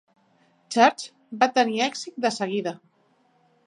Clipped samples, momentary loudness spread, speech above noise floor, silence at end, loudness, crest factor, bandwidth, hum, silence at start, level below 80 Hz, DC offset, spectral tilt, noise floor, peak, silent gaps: under 0.1%; 17 LU; 41 dB; 0.9 s; -23 LUFS; 22 dB; 11.5 kHz; none; 0.7 s; -80 dBFS; under 0.1%; -3.5 dB/octave; -64 dBFS; -4 dBFS; none